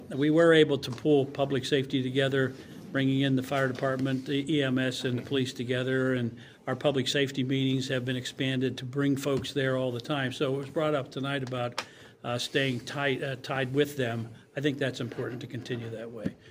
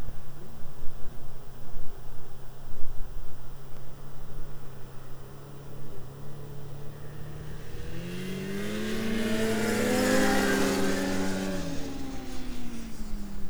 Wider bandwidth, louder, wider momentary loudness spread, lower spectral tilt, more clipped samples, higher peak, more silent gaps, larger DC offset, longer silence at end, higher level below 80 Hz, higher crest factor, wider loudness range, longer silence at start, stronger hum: second, 16 kHz vs over 20 kHz; about the same, -29 LUFS vs -31 LUFS; second, 10 LU vs 20 LU; first, -6 dB/octave vs -4.5 dB/octave; neither; about the same, -8 dBFS vs -8 dBFS; neither; neither; about the same, 0 s vs 0 s; second, -66 dBFS vs -40 dBFS; about the same, 20 dB vs 16 dB; second, 3 LU vs 18 LU; about the same, 0 s vs 0 s; neither